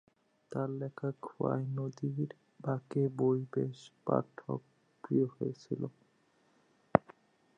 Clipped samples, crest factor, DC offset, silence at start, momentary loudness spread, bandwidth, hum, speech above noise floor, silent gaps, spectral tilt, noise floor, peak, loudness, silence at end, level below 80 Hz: under 0.1%; 32 dB; under 0.1%; 0.5 s; 10 LU; 8.6 kHz; none; 36 dB; none; -9 dB/octave; -71 dBFS; -4 dBFS; -36 LUFS; 0.6 s; -72 dBFS